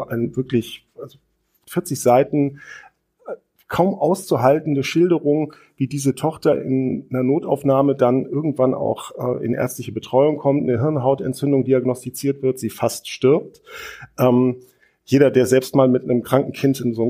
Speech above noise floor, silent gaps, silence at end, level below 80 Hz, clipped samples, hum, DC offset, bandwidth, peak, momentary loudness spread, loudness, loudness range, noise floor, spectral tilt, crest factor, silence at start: 46 dB; none; 0 s; -60 dBFS; under 0.1%; none; under 0.1%; 15.5 kHz; -2 dBFS; 18 LU; -19 LUFS; 3 LU; -65 dBFS; -6.5 dB/octave; 18 dB; 0 s